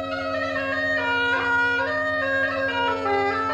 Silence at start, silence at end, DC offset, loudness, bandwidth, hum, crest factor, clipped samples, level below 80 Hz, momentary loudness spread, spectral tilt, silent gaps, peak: 0 s; 0 s; under 0.1%; -22 LUFS; 11 kHz; none; 12 dB; under 0.1%; -54 dBFS; 4 LU; -4.5 dB/octave; none; -12 dBFS